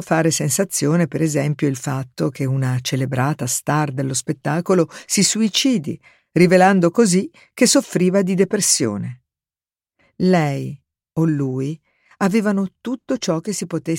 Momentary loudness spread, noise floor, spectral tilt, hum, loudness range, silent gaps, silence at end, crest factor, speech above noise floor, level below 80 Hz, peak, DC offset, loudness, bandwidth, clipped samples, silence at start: 11 LU; under -90 dBFS; -4.5 dB/octave; none; 6 LU; none; 0 s; 18 dB; over 72 dB; -62 dBFS; -2 dBFS; under 0.1%; -18 LUFS; 17 kHz; under 0.1%; 0 s